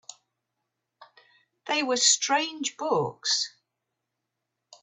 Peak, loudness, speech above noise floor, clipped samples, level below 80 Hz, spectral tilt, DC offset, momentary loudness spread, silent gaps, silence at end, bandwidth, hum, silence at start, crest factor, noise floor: -8 dBFS; -25 LUFS; 57 dB; under 0.1%; -76 dBFS; -1 dB/octave; under 0.1%; 11 LU; none; 1.35 s; 8.6 kHz; none; 0.1 s; 22 dB; -83 dBFS